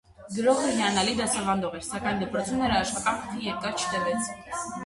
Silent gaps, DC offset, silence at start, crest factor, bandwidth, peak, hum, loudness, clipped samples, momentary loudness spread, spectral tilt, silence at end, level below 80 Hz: none; under 0.1%; 0.2 s; 18 dB; 11.5 kHz; -10 dBFS; none; -27 LUFS; under 0.1%; 8 LU; -3.5 dB/octave; 0 s; -52 dBFS